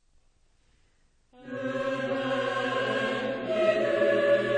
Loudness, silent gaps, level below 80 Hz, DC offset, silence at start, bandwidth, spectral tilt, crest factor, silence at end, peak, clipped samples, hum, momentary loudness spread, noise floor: -27 LUFS; none; -64 dBFS; under 0.1%; 1.4 s; 9.6 kHz; -5.5 dB/octave; 16 dB; 0 s; -12 dBFS; under 0.1%; none; 8 LU; -65 dBFS